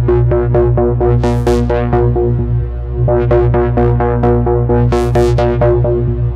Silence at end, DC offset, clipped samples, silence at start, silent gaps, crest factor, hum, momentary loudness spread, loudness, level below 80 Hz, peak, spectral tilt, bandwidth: 0 s; under 0.1%; under 0.1%; 0 s; none; 10 dB; 60 Hz at -20 dBFS; 3 LU; -13 LUFS; -18 dBFS; 0 dBFS; -9 dB/octave; 9 kHz